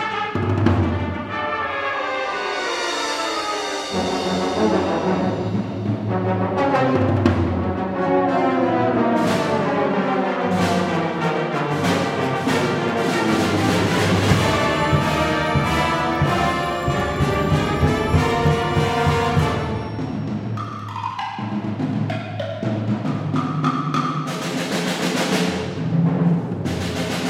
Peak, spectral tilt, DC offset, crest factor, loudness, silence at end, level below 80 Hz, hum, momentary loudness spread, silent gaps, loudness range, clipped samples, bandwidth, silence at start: -2 dBFS; -6 dB/octave; under 0.1%; 18 dB; -21 LUFS; 0 s; -40 dBFS; none; 7 LU; none; 5 LU; under 0.1%; 16 kHz; 0 s